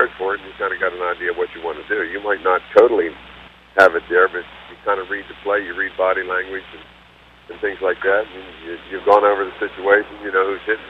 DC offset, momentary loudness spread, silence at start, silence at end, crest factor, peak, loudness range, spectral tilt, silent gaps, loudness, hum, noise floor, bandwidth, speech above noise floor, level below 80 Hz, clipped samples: under 0.1%; 16 LU; 0 s; 0 s; 20 dB; 0 dBFS; 6 LU; -5 dB/octave; none; -19 LUFS; 60 Hz at -50 dBFS; -47 dBFS; 8.2 kHz; 28 dB; -52 dBFS; under 0.1%